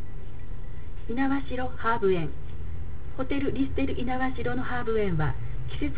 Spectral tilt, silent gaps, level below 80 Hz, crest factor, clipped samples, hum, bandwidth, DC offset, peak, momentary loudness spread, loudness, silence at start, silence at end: -10.5 dB/octave; none; -38 dBFS; 16 dB; under 0.1%; none; 4 kHz; 5%; -12 dBFS; 16 LU; -30 LUFS; 0 s; 0 s